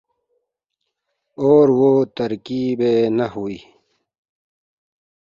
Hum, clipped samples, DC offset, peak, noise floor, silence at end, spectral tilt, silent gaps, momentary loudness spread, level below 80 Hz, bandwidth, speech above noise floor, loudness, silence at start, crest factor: none; under 0.1%; under 0.1%; -2 dBFS; -78 dBFS; 1.65 s; -8.5 dB/octave; none; 14 LU; -62 dBFS; 7.2 kHz; 61 dB; -17 LUFS; 1.4 s; 18 dB